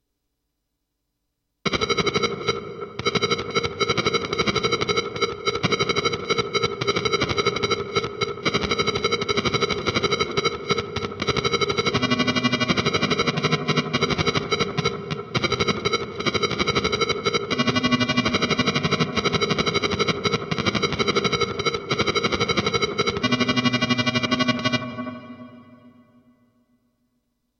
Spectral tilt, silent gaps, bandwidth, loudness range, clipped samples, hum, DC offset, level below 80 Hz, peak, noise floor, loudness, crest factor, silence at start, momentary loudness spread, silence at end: -4 dB/octave; none; 10.5 kHz; 2 LU; under 0.1%; none; under 0.1%; -48 dBFS; -2 dBFS; -78 dBFS; -22 LUFS; 20 dB; 1.65 s; 4 LU; 1.7 s